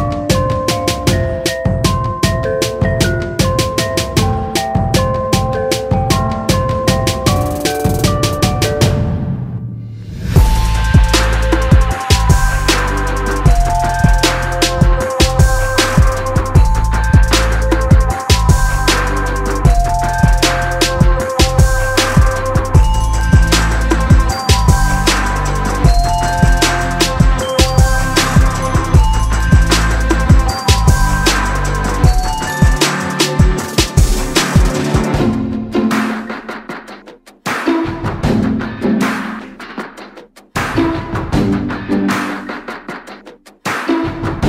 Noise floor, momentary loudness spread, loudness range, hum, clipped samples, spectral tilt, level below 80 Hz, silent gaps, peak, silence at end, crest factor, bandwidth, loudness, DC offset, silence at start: -39 dBFS; 8 LU; 6 LU; none; under 0.1%; -5 dB/octave; -16 dBFS; none; 0 dBFS; 0 s; 12 dB; 16 kHz; -14 LUFS; under 0.1%; 0 s